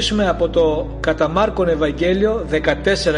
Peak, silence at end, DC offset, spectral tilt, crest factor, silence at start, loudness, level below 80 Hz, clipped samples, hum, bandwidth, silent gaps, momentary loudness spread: -2 dBFS; 0 s; under 0.1%; -5 dB/octave; 14 dB; 0 s; -18 LUFS; -30 dBFS; under 0.1%; none; 10.5 kHz; none; 2 LU